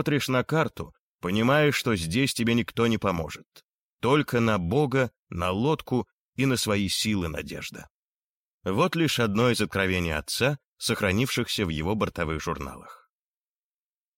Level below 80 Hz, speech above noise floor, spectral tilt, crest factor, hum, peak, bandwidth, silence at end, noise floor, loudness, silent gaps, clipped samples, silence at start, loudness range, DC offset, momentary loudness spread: -50 dBFS; over 64 dB; -5 dB/octave; 16 dB; none; -10 dBFS; 16.5 kHz; 1.25 s; under -90 dBFS; -26 LUFS; 0.99-1.19 s, 3.46-3.51 s, 3.64-3.98 s, 5.17-5.27 s, 6.13-6.32 s, 7.90-8.61 s, 10.65-10.76 s; under 0.1%; 0 s; 3 LU; under 0.1%; 13 LU